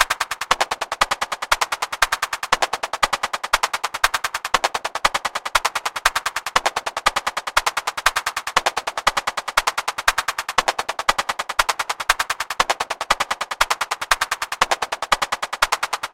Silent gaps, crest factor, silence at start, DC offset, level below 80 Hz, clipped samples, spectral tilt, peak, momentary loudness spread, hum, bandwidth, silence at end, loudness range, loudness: none; 22 dB; 0 s; under 0.1%; -44 dBFS; under 0.1%; 0.5 dB/octave; 0 dBFS; 3 LU; none; 17 kHz; 0.05 s; 0 LU; -21 LUFS